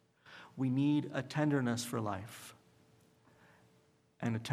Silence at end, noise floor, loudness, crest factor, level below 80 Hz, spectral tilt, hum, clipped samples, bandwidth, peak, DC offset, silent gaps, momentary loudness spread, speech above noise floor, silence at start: 0 s; -70 dBFS; -35 LUFS; 18 dB; -78 dBFS; -6 dB/octave; none; under 0.1%; 15.5 kHz; -18 dBFS; under 0.1%; none; 20 LU; 35 dB; 0.25 s